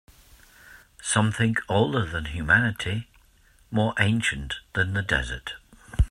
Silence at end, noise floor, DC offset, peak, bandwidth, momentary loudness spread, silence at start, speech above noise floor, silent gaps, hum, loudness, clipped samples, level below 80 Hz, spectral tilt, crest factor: 0 s; -58 dBFS; under 0.1%; -4 dBFS; 13 kHz; 13 LU; 0.65 s; 33 dB; none; none; -25 LUFS; under 0.1%; -36 dBFS; -4.5 dB/octave; 22 dB